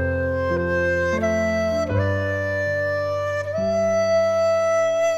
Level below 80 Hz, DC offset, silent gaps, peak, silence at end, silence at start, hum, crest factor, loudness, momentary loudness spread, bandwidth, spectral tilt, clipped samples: -44 dBFS; under 0.1%; none; -8 dBFS; 0 s; 0 s; none; 12 dB; -21 LUFS; 4 LU; 12.5 kHz; -6 dB/octave; under 0.1%